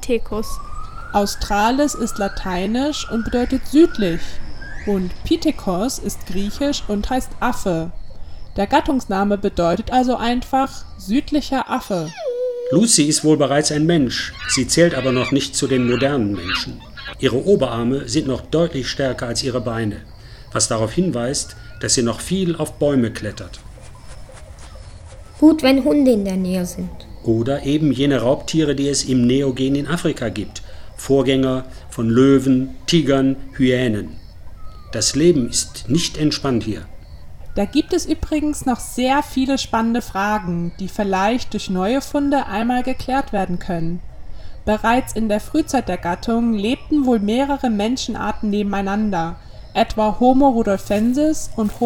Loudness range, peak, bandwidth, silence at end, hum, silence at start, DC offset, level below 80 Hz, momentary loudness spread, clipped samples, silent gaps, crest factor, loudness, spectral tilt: 4 LU; 0 dBFS; 17 kHz; 0 s; none; 0 s; under 0.1%; -36 dBFS; 12 LU; under 0.1%; none; 18 dB; -19 LUFS; -4.5 dB/octave